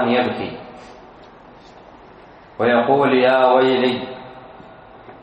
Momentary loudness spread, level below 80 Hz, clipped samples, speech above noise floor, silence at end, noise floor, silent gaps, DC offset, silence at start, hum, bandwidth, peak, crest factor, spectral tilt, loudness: 25 LU; -58 dBFS; under 0.1%; 27 dB; 0.1 s; -44 dBFS; none; under 0.1%; 0 s; none; 8.4 kHz; -2 dBFS; 18 dB; -7 dB/octave; -17 LUFS